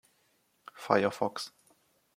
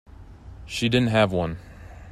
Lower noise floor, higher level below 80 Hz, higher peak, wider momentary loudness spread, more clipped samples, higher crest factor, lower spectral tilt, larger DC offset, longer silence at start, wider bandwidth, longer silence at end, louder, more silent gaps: first, -72 dBFS vs -43 dBFS; second, -78 dBFS vs -46 dBFS; about the same, -8 dBFS vs -6 dBFS; second, 19 LU vs 24 LU; neither; first, 28 dB vs 20 dB; about the same, -5 dB/octave vs -6 dB/octave; neither; first, 0.75 s vs 0.2 s; first, 16 kHz vs 14 kHz; first, 0.7 s vs 0 s; second, -31 LUFS vs -23 LUFS; neither